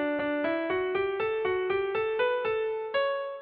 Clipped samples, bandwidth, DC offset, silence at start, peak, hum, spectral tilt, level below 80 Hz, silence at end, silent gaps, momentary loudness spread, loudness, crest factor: under 0.1%; 4.8 kHz; under 0.1%; 0 s; -16 dBFS; none; -2 dB/octave; -62 dBFS; 0 s; none; 2 LU; -29 LUFS; 12 dB